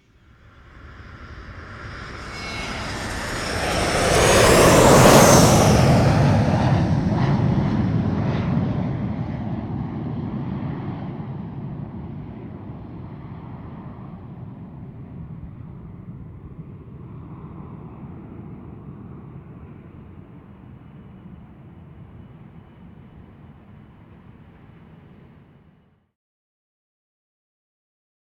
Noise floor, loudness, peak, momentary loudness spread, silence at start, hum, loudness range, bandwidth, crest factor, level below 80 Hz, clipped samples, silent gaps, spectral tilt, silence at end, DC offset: -57 dBFS; -18 LUFS; 0 dBFS; 26 LU; 0.85 s; none; 25 LU; 19 kHz; 22 dB; -38 dBFS; under 0.1%; none; -5 dB/octave; 4.7 s; under 0.1%